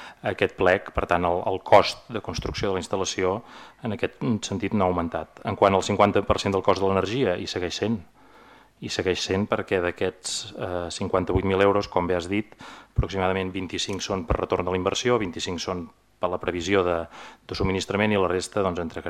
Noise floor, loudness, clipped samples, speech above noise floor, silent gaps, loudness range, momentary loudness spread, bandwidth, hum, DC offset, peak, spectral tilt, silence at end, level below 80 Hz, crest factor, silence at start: -52 dBFS; -25 LUFS; under 0.1%; 27 dB; none; 4 LU; 10 LU; 13.5 kHz; none; under 0.1%; -4 dBFS; -5 dB/octave; 0 s; -44 dBFS; 20 dB; 0 s